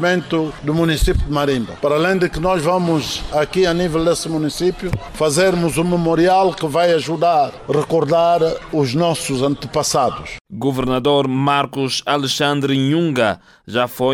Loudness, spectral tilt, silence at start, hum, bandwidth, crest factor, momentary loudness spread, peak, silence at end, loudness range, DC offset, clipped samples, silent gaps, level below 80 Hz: -17 LUFS; -5 dB/octave; 0 s; none; 16 kHz; 14 dB; 6 LU; -4 dBFS; 0 s; 2 LU; under 0.1%; under 0.1%; 10.41-10.45 s; -34 dBFS